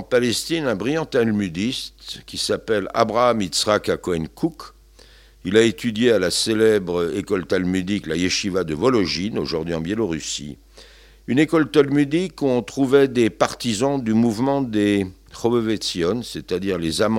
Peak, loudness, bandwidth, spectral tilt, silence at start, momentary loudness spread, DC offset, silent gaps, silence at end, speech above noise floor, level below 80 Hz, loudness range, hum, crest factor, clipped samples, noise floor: 0 dBFS; -21 LUFS; 16.5 kHz; -4.5 dB/octave; 0 s; 9 LU; under 0.1%; none; 0 s; 28 dB; -50 dBFS; 3 LU; none; 20 dB; under 0.1%; -48 dBFS